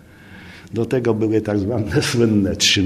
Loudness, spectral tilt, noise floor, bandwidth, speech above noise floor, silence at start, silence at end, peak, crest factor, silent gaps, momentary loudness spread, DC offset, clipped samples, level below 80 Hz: -19 LUFS; -4.5 dB/octave; -41 dBFS; 14 kHz; 23 dB; 0.3 s; 0 s; -4 dBFS; 16 dB; none; 13 LU; under 0.1%; under 0.1%; -46 dBFS